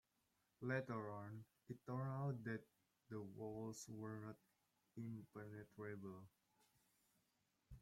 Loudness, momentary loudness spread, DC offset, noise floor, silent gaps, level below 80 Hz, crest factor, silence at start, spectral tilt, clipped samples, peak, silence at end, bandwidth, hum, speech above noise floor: -52 LUFS; 13 LU; under 0.1%; -86 dBFS; none; -80 dBFS; 20 dB; 0.6 s; -7 dB/octave; under 0.1%; -32 dBFS; 0 s; 16 kHz; none; 36 dB